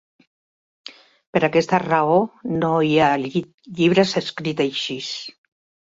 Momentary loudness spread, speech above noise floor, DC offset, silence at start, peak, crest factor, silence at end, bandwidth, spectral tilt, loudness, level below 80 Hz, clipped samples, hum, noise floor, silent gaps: 19 LU; over 70 dB; under 0.1%; 0.85 s; -2 dBFS; 20 dB; 0.6 s; 7.8 kHz; -5.5 dB/octave; -20 LUFS; -60 dBFS; under 0.1%; none; under -90 dBFS; 1.27-1.33 s, 3.54-3.58 s